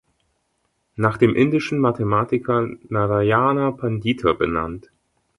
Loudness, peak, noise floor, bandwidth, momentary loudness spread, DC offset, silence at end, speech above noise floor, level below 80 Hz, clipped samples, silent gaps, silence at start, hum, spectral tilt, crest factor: -20 LUFS; -2 dBFS; -70 dBFS; 11.5 kHz; 8 LU; under 0.1%; 0.6 s; 51 dB; -48 dBFS; under 0.1%; none; 1 s; none; -8 dB/octave; 18 dB